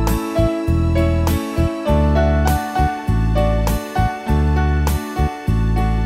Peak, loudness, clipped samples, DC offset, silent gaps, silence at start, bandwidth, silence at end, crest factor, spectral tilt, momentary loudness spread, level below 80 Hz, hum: -2 dBFS; -18 LUFS; under 0.1%; under 0.1%; none; 0 s; 16 kHz; 0 s; 14 dB; -7 dB/octave; 4 LU; -22 dBFS; none